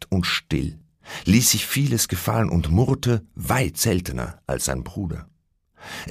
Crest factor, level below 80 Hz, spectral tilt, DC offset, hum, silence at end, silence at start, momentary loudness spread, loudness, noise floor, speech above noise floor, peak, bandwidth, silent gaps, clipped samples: 18 dB; -38 dBFS; -4.5 dB/octave; under 0.1%; none; 0 s; 0 s; 13 LU; -22 LUFS; -58 dBFS; 36 dB; -4 dBFS; 15.5 kHz; none; under 0.1%